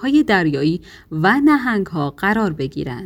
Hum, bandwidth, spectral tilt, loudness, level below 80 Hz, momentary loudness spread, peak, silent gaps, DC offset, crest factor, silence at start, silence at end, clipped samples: none; 16 kHz; -7 dB/octave; -18 LUFS; -46 dBFS; 10 LU; -2 dBFS; none; under 0.1%; 16 dB; 0 s; 0 s; under 0.1%